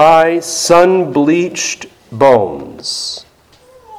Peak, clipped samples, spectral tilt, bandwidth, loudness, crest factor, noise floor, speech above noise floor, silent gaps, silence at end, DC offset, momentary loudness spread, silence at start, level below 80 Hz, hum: 0 dBFS; 0.6%; -4 dB/octave; 16 kHz; -12 LUFS; 12 dB; -46 dBFS; 35 dB; none; 0 s; under 0.1%; 14 LU; 0 s; -50 dBFS; none